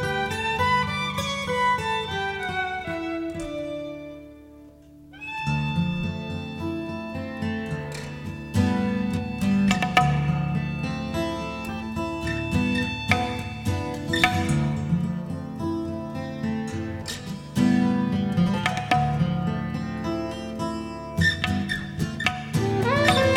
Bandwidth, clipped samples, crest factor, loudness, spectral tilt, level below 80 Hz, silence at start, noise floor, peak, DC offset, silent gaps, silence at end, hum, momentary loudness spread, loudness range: 16.5 kHz; under 0.1%; 22 dB; -26 LUFS; -5.5 dB/octave; -44 dBFS; 0 s; -48 dBFS; -4 dBFS; under 0.1%; none; 0 s; none; 11 LU; 6 LU